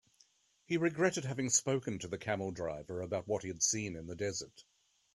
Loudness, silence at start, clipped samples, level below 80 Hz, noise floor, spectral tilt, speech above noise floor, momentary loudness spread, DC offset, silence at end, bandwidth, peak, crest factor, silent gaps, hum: -35 LUFS; 0.7 s; under 0.1%; -68 dBFS; -70 dBFS; -3.5 dB/octave; 34 dB; 10 LU; under 0.1%; 0.55 s; 12.5 kHz; -16 dBFS; 22 dB; none; none